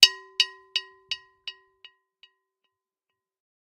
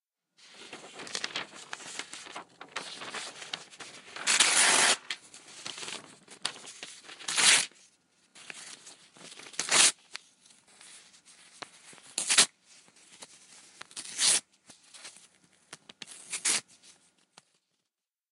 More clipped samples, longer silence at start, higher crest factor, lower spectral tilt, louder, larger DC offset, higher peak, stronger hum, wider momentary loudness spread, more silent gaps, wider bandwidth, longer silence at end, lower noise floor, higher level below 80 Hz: neither; second, 0 s vs 0.6 s; about the same, 30 dB vs 30 dB; second, 3.5 dB/octave vs 1.5 dB/octave; about the same, -25 LUFS vs -26 LUFS; neither; first, 0 dBFS vs -4 dBFS; neither; second, 18 LU vs 26 LU; neither; about the same, 15.5 kHz vs 16 kHz; first, 2.2 s vs 1.7 s; about the same, -86 dBFS vs -88 dBFS; first, -78 dBFS vs -84 dBFS